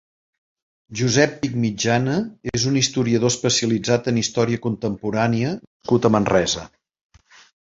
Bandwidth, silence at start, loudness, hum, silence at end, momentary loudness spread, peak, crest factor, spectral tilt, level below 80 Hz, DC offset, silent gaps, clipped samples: 7.8 kHz; 0.9 s; -20 LUFS; none; 1 s; 7 LU; -2 dBFS; 20 dB; -4.5 dB/octave; -50 dBFS; under 0.1%; 5.67-5.80 s; under 0.1%